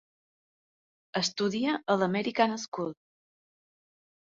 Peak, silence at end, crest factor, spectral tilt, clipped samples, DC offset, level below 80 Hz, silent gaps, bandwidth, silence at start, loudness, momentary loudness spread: -8 dBFS; 1.4 s; 24 dB; -4.5 dB/octave; under 0.1%; under 0.1%; -74 dBFS; 2.68-2.72 s; 7.8 kHz; 1.15 s; -29 LUFS; 9 LU